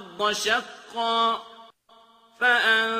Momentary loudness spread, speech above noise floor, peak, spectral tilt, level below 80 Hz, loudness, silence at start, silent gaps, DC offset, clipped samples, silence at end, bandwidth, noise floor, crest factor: 11 LU; 33 dB; -8 dBFS; -1 dB/octave; -70 dBFS; -23 LUFS; 0 s; none; under 0.1%; under 0.1%; 0 s; 15.5 kHz; -56 dBFS; 16 dB